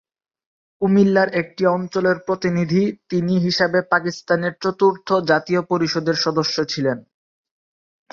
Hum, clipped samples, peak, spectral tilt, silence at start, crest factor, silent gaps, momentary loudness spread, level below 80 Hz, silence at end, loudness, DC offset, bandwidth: none; under 0.1%; -2 dBFS; -6 dB/octave; 0.8 s; 18 dB; none; 5 LU; -60 dBFS; 1.1 s; -19 LUFS; under 0.1%; 7.2 kHz